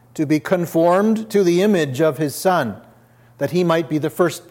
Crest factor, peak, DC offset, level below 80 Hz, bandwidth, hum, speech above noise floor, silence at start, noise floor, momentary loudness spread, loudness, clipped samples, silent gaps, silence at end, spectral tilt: 16 dB; -2 dBFS; under 0.1%; -66 dBFS; 17 kHz; none; 32 dB; 0.15 s; -50 dBFS; 7 LU; -18 LUFS; under 0.1%; none; 0.1 s; -6 dB/octave